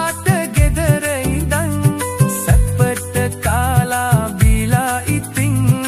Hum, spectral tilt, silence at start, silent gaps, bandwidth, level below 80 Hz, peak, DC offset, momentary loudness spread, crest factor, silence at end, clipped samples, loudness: none; -5.5 dB/octave; 0 s; none; 15.5 kHz; -22 dBFS; 0 dBFS; under 0.1%; 4 LU; 14 dB; 0 s; under 0.1%; -16 LUFS